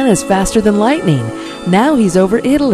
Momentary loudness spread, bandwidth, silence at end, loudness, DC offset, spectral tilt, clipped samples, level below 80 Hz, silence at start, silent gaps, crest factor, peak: 6 LU; 14 kHz; 0 s; -12 LUFS; under 0.1%; -5.5 dB/octave; 0.2%; -34 dBFS; 0 s; none; 12 dB; 0 dBFS